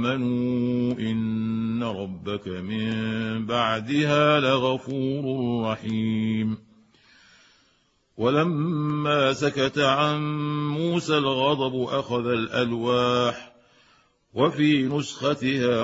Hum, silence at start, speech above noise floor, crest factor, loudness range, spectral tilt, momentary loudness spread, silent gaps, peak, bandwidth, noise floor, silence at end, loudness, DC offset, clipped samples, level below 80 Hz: none; 0 s; 42 dB; 18 dB; 4 LU; -6 dB/octave; 7 LU; none; -6 dBFS; 8 kHz; -66 dBFS; 0 s; -24 LUFS; under 0.1%; under 0.1%; -60 dBFS